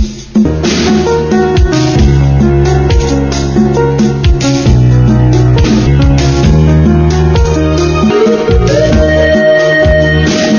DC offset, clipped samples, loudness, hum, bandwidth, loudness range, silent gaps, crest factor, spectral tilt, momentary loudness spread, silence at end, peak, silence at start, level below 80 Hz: under 0.1%; 1%; -8 LUFS; none; 7.2 kHz; 1 LU; none; 8 dB; -6.5 dB/octave; 3 LU; 0 s; 0 dBFS; 0 s; -14 dBFS